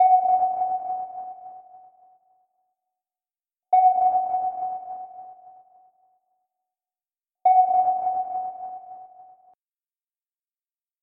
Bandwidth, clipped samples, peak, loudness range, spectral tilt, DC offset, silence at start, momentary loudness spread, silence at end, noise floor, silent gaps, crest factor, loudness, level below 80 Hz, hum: 2.4 kHz; under 0.1%; -10 dBFS; 7 LU; -8 dB/octave; under 0.1%; 0 s; 23 LU; 1.8 s; under -90 dBFS; none; 16 dB; -22 LUFS; -76 dBFS; none